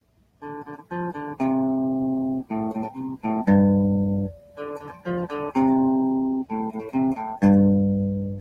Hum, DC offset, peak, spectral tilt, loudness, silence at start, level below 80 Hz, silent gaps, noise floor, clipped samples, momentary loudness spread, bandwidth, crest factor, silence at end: none; under 0.1%; -6 dBFS; -10.5 dB/octave; -23 LUFS; 0.4 s; -52 dBFS; none; -43 dBFS; under 0.1%; 17 LU; 5 kHz; 16 dB; 0 s